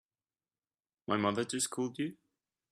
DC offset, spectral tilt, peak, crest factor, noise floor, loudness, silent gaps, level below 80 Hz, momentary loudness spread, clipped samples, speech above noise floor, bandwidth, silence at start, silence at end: under 0.1%; -3.5 dB/octave; -16 dBFS; 22 dB; under -90 dBFS; -35 LUFS; none; -78 dBFS; 8 LU; under 0.1%; over 56 dB; 14.5 kHz; 1.1 s; 0.6 s